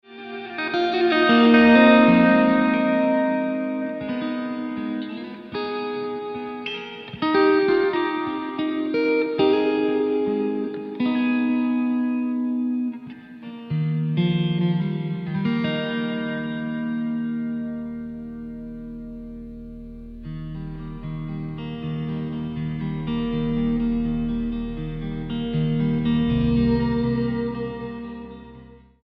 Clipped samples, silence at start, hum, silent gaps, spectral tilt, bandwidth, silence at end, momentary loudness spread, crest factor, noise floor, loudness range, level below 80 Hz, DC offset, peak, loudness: under 0.1%; 0.1 s; none; none; -9 dB/octave; 5.6 kHz; 0.25 s; 17 LU; 18 dB; -46 dBFS; 14 LU; -42 dBFS; under 0.1%; -4 dBFS; -22 LUFS